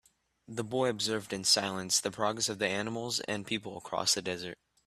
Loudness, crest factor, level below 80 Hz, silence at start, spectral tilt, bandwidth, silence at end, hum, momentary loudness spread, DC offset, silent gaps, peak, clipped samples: -31 LUFS; 20 dB; -70 dBFS; 0.5 s; -2 dB/octave; 15 kHz; 0.3 s; none; 11 LU; under 0.1%; none; -12 dBFS; under 0.1%